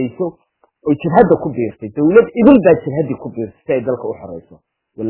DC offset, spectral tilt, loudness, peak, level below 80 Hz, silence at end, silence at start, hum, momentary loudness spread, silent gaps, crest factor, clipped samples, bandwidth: under 0.1%; -12 dB/octave; -14 LUFS; 0 dBFS; -46 dBFS; 0 s; 0 s; none; 16 LU; none; 14 dB; 0.2%; 4 kHz